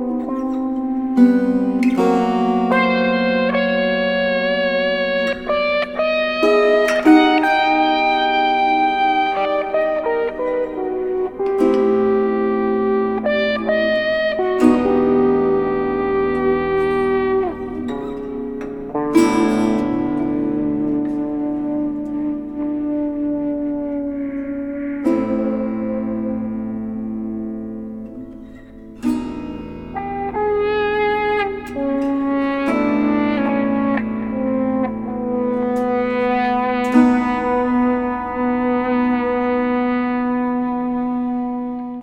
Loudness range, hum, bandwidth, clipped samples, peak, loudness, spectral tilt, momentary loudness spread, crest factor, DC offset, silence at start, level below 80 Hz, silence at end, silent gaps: 7 LU; none; 12 kHz; under 0.1%; 0 dBFS; -18 LUFS; -6 dB/octave; 10 LU; 18 dB; under 0.1%; 0 s; -46 dBFS; 0 s; none